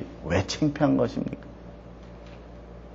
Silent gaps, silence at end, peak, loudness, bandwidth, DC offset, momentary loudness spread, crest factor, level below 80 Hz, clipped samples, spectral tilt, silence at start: none; 0 s; -8 dBFS; -26 LUFS; 7.8 kHz; under 0.1%; 22 LU; 20 dB; -46 dBFS; under 0.1%; -6 dB/octave; 0 s